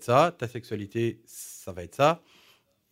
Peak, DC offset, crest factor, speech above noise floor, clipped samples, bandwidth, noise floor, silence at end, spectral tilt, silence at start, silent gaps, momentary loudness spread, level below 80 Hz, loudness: -8 dBFS; under 0.1%; 20 dB; 35 dB; under 0.1%; 16 kHz; -63 dBFS; 0.75 s; -5.5 dB/octave; 0 s; none; 17 LU; -66 dBFS; -27 LUFS